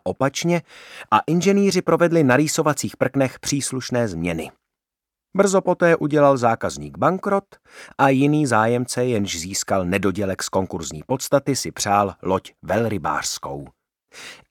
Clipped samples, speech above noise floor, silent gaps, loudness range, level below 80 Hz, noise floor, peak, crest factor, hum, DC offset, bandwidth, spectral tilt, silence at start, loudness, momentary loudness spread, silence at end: under 0.1%; 67 dB; none; 4 LU; -54 dBFS; -87 dBFS; -2 dBFS; 20 dB; none; under 0.1%; 18 kHz; -5 dB/octave; 0.05 s; -20 LUFS; 12 LU; 0.15 s